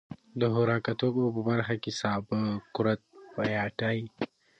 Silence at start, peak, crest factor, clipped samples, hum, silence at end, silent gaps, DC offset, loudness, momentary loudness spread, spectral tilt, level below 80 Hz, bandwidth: 0.1 s; -12 dBFS; 18 dB; under 0.1%; none; 0.35 s; none; under 0.1%; -30 LUFS; 8 LU; -6.5 dB/octave; -64 dBFS; 8.8 kHz